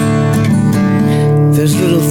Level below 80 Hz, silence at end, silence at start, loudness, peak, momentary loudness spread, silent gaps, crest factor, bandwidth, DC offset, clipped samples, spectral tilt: -38 dBFS; 0 s; 0 s; -11 LUFS; -2 dBFS; 1 LU; none; 10 dB; 17.5 kHz; under 0.1%; under 0.1%; -7 dB/octave